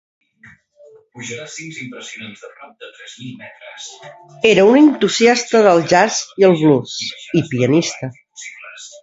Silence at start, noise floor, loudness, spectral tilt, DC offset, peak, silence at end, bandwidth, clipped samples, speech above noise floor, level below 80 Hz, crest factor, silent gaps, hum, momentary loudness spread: 1.15 s; -47 dBFS; -14 LUFS; -4.5 dB/octave; under 0.1%; 0 dBFS; 0.15 s; 8 kHz; under 0.1%; 32 dB; -60 dBFS; 16 dB; none; none; 22 LU